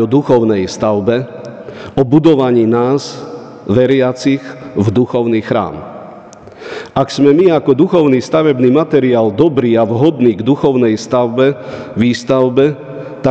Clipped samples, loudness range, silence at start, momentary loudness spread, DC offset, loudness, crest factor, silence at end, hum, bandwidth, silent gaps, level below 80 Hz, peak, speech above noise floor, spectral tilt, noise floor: under 0.1%; 4 LU; 0 s; 17 LU; under 0.1%; -12 LUFS; 12 dB; 0 s; none; 8.6 kHz; none; -48 dBFS; 0 dBFS; 23 dB; -7 dB/octave; -34 dBFS